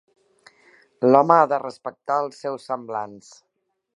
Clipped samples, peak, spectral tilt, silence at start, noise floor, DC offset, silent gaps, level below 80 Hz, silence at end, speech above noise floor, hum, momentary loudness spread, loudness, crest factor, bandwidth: under 0.1%; 0 dBFS; -7 dB/octave; 1 s; -56 dBFS; under 0.1%; none; -74 dBFS; 0.8 s; 36 dB; none; 18 LU; -21 LUFS; 22 dB; 11.5 kHz